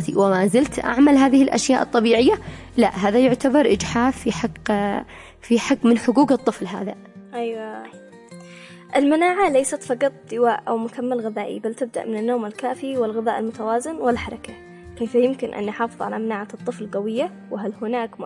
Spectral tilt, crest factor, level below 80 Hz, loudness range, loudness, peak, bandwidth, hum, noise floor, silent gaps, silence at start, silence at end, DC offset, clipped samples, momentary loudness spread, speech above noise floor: -5 dB/octave; 14 dB; -50 dBFS; 7 LU; -21 LUFS; -6 dBFS; 11.5 kHz; none; -42 dBFS; none; 0 s; 0 s; under 0.1%; under 0.1%; 13 LU; 22 dB